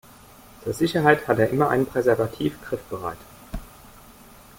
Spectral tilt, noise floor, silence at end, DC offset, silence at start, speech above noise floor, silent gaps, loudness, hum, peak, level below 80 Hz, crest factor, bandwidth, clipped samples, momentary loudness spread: -6.5 dB/octave; -48 dBFS; 0.95 s; under 0.1%; 0.6 s; 26 dB; none; -23 LUFS; none; -4 dBFS; -48 dBFS; 22 dB; 17 kHz; under 0.1%; 20 LU